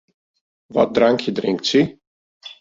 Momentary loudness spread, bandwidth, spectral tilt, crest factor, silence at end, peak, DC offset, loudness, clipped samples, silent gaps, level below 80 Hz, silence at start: 9 LU; 7.8 kHz; -5 dB/octave; 18 dB; 0.1 s; -2 dBFS; under 0.1%; -19 LUFS; under 0.1%; 2.07-2.41 s; -58 dBFS; 0.7 s